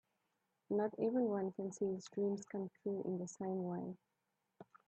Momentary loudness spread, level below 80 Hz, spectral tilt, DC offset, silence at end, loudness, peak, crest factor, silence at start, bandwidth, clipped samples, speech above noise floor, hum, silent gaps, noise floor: 8 LU; -86 dBFS; -7.5 dB/octave; under 0.1%; 0.25 s; -41 LUFS; -26 dBFS; 16 dB; 0.7 s; 8.6 kHz; under 0.1%; 45 dB; none; none; -85 dBFS